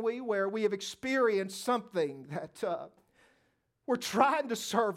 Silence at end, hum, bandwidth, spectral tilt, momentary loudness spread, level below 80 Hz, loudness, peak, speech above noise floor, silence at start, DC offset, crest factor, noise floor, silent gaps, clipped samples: 0 s; none; 16.5 kHz; -4 dB/octave; 13 LU; -78 dBFS; -32 LUFS; -10 dBFS; 43 dB; 0 s; under 0.1%; 22 dB; -75 dBFS; none; under 0.1%